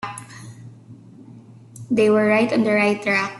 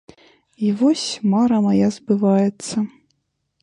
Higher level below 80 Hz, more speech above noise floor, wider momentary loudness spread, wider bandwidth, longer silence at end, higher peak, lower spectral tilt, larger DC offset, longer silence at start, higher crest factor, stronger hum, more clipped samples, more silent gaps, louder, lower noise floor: about the same, -62 dBFS vs -62 dBFS; second, 26 dB vs 53 dB; first, 23 LU vs 8 LU; about the same, 12 kHz vs 11 kHz; second, 0 s vs 0.75 s; about the same, -6 dBFS vs -6 dBFS; about the same, -5.5 dB/octave vs -6 dB/octave; neither; second, 0.05 s vs 0.6 s; about the same, 16 dB vs 14 dB; neither; neither; neither; about the same, -18 LUFS vs -19 LUFS; second, -44 dBFS vs -71 dBFS